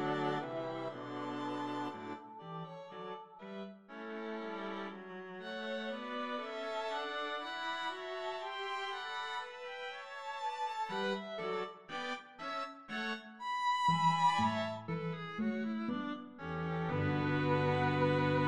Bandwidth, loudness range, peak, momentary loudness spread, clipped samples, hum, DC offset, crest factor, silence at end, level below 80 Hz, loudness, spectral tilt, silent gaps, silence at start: 11 kHz; 9 LU; -20 dBFS; 15 LU; under 0.1%; none; under 0.1%; 18 dB; 0 s; -74 dBFS; -38 LUFS; -6 dB/octave; none; 0 s